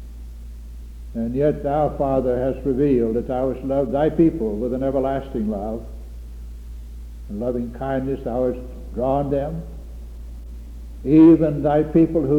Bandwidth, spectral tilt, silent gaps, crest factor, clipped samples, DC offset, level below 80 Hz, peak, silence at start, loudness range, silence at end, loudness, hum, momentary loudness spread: 4.8 kHz; -10 dB/octave; none; 18 dB; under 0.1%; under 0.1%; -34 dBFS; -4 dBFS; 0 s; 8 LU; 0 s; -20 LUFS; none; 21 LU